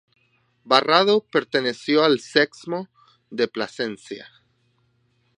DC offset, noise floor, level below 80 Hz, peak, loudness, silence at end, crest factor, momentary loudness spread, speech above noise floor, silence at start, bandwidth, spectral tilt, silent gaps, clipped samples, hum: under 0.1%; -66 dBFS; -76 dBFS; 0 dBFS; -21 LUFS; 1.15 s; 24 dB; 18 LU; 45 dB; 0.65 s; 11 kHz; -4.5 dB/octave; none; under 0.1%; none